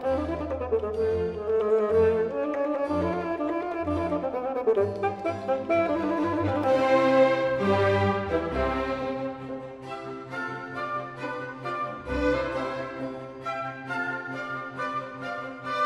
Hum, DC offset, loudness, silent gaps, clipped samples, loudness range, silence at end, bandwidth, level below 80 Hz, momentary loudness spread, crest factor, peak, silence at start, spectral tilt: none; under 0.1%; -27 LUFS; none; under 0.1%; 8 LU; 0 s; 10.5 kHz; -48 dBFS; 12 LU; 16 dB; -10 dBFS; 0 s; -7 dB/octave